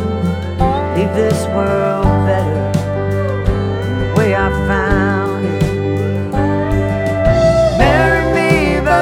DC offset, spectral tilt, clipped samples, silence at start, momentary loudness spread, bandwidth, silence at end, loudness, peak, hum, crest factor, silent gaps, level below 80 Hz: under 0.1%; -7 dB/octave; under 0.1%; 0 s; 6 LU; 14.5 kHz; 0 s; -15 LUFS; -2 dBFS; none; 12 dB; none; -24 dBFS